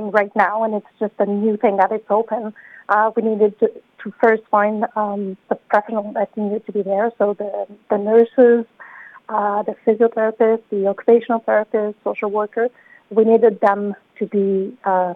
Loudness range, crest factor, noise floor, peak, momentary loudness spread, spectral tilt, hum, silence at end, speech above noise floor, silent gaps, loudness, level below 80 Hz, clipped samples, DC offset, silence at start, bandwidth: 3 LU; 16 dB; -41 dBFS; -2 dBFS; 11 LU; -9 dB/octave; none; 0 s; 23 dB; none; -18 LUFS; -74 dBFS; under 0.1%; under 0.1%; 0 s; 4.2 kHz